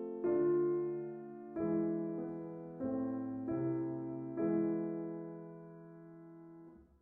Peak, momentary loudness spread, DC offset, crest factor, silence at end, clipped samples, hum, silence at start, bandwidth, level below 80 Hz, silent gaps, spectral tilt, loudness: -24 dBFS; 21 LU; under 0.1%; 14 dB; 0.2 s; under 0.1%; none; 0 s; 2.6 kHz; -72 dBFS; none; -11.5 dB/octave; -38 LUFS